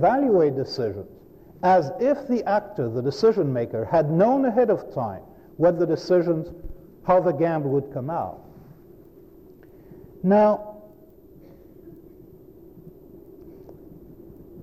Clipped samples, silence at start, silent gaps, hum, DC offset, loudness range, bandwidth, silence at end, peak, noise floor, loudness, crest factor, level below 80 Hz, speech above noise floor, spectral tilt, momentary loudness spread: under 0.1%; 0 s; none; none; under 0.1%; 5 LU; 14.5 kHz; 0 s; -8 dBFS; -49 dBFS; -22 LUFS; 16 dB; -54 dBFS; 28 dB; -8 dB/octave; 14 LU